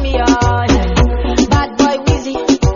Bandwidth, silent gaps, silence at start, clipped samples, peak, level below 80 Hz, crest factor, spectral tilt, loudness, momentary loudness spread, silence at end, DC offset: 7.4 kHz; none; 0 s; under 0.1%; 0 dBFS; -18 dBFS; 12 dB; -5.5 dB/octave; -13 LUFS; 3 LU; 0 s; under 0.1%